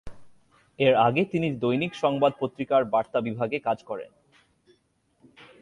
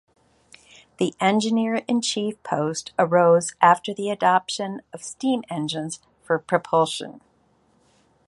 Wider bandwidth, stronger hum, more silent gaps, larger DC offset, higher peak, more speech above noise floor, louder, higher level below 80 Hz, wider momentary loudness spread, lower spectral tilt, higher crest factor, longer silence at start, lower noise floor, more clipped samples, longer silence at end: about the same, 11 kHz vs 11.5 kHz; neither; neither; neither; second, -8 dBFS vs -2 dBFS; about the same, 44 dB vs 41 dB; second, -25 LUFS vs -22 LUFS; first, -60 dBFS vs -68 dBFS; about the same, 11 LU vs 13 LU; first, -7.5 dB/octave vs -4.5 dB/octave; about the same, 18 dB vs 22 dB; second, 0.05 s vs 1 s; first, -68 dBFS vs -62 dBFS; neither; second, 0.15 s vs 1.1 s